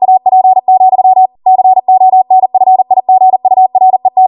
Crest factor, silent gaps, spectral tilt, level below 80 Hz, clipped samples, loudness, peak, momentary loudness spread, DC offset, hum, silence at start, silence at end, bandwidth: 6 dB; none; -10 dB/octave; -64 dBFS; under 0.1%; -7 LUFS; 0 dBFS; 2 LU; under 0.1%; none; 0 s; 0 s; 1.1 kHz